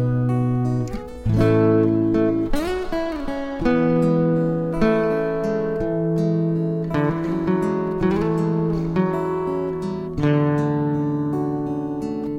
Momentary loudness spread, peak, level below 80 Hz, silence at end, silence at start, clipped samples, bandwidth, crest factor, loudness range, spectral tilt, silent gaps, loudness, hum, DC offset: 7 LU; -4 dBFS; -38 dBFS; 0 s; 0 s; under 0.1%; 11 kHz; 16 dB; 2 LU; -9 dB/octave; none; -21 LUFS; none; under 0.1%